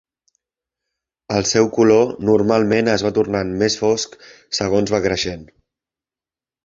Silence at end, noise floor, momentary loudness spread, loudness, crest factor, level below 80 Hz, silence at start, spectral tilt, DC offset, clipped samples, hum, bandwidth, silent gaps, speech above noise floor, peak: 1.2 s; under -90 dBFS; 9 LU; -17 LUFS; 18 dB; -48 dBFS; 1.3 s; -4.5 dB/octave; under 0.1%; under 0.1%; none; 7.8 kHz; none; over 73 dB; -2 dBFS